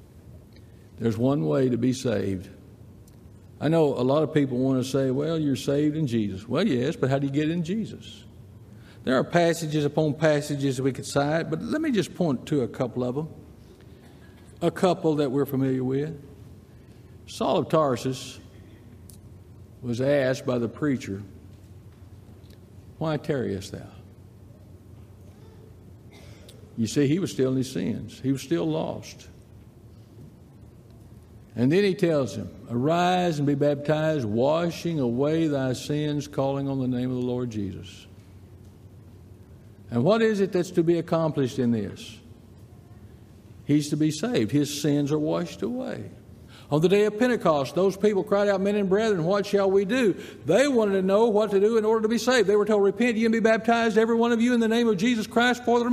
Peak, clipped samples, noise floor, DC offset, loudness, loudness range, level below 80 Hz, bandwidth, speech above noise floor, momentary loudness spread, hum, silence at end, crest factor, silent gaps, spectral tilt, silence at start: -6 dBFS; under 0.1%; -49 dBFS; under 0.1%; -24 LUFS; 10 LU; -60 dBFS; 15 kHz; 25 dB; 11 LU; none; 0 s; 18 dB; none; -6.5 dB/octave; 0.15 s